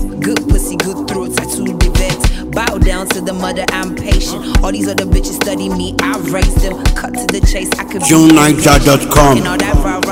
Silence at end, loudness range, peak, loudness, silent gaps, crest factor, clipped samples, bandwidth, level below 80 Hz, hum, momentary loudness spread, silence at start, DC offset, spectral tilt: 0 s; 6 LU; 0 dBFS; -13 LUFS; none; 12 dB; 0.8%; 17.5 kHz; -16 dBFS; none; 9 LU; 0 s; under 0.1%; -4.5 dB/octave